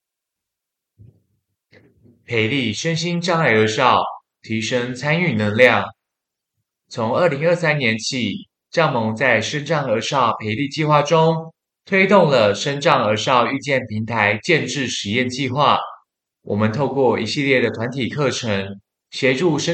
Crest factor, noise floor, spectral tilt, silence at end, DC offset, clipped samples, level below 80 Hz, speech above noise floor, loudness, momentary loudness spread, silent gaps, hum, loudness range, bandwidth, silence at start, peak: 20 dB; -83 dBFS; -5 dB/octave; 0 s; under 0.1%; under 0.1%; -64 dBFS; 65 dB; -18 LUFS; 10 LU; none; none; 4 LU; 9 kHz; 2.3 s; 0 dBFS